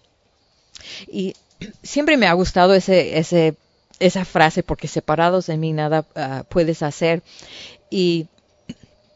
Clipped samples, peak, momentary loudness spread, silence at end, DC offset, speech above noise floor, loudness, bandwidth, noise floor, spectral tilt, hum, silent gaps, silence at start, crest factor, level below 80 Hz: under 0.1%; 0 dBFS; 22 LU; 0.45 s; under 0.1%; 43 dB; -19 LUFS; 8 kHz; -62 dBFS; -5.5 dB/octave; none; none; 0.85 s; 20 dB; -44 dBFS